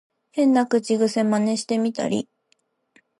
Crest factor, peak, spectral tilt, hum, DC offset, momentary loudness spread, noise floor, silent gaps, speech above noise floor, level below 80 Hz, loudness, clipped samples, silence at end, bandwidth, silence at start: 16 dB; -8 dBFS; -5 dB/octave; none; under 0.1%; 9 LU; -68 dBFS; none; 47 dB; -72 dBFS; -22 LUFS; under 0.1%; 1 s; 11.5 kHz; 0.35 s